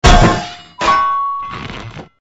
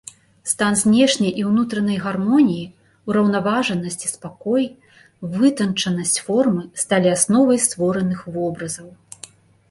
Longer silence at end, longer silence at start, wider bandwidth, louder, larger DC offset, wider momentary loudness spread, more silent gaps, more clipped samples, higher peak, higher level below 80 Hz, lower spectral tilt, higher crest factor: second, 0.15 s vs 0.75 s; second, 0 s vs 0.45 s; second, 9.8 kHz vs 11.5 kHz; first, -14 LUFS vs -19 LUFS; neither; first, 18 LU vs 14 LU; neither; first, 0.2% vs under 0.1%; about the same, 0 dBFS vs 0 dBFS; first, -20 dBFS vs -58 dBFS; about the same, -4.5 dB/octave vs -4.5 dB/octave; about the same, 14 dB vs 18 dB